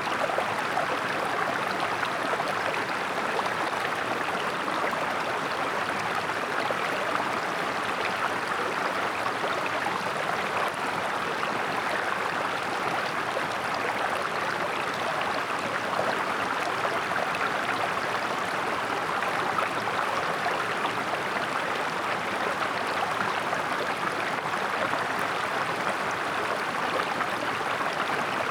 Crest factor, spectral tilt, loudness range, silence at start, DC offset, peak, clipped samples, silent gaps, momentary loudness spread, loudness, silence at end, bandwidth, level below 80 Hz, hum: 16 dB; -3 dB/octave; 1 LU; 0 s; under 0.1%; -12 dBFS; under 0.1%; none; 1 LU; -28 LUFS; 0 s; over 20 kHz; -66 dBFS; none